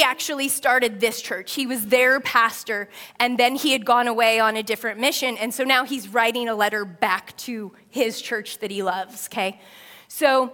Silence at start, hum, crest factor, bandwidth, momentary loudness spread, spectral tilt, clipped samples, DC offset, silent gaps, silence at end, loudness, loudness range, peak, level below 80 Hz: 0 s; none; 20 dB; 18 kHz; 11 LU; -2 dB/octave; under 0.1%; under 0.1%; none; 0 s; -21 LUFS; 6 LU; -2 dBFS; -72 dBFS